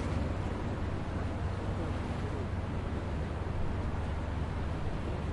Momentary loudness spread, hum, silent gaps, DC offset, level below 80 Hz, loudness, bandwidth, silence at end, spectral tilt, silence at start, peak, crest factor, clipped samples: 1 LU; none; none; under 0.1%; -40 dBFS; -36 LUFS; 11 kHz; 0 s; -7.5 dB/octave; 0 s; -22 dBFS; 12 dB; under 0.1%